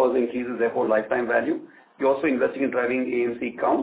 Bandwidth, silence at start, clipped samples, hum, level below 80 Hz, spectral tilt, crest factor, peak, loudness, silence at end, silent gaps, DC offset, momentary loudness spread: 4 kHz; 0 s; under 0.1%; none; -62 dBFS; -9.5 dB/octave; 14 dB; -8 dBFS; -24 LUFS; 0 s; none; under 0.1%; 5 LU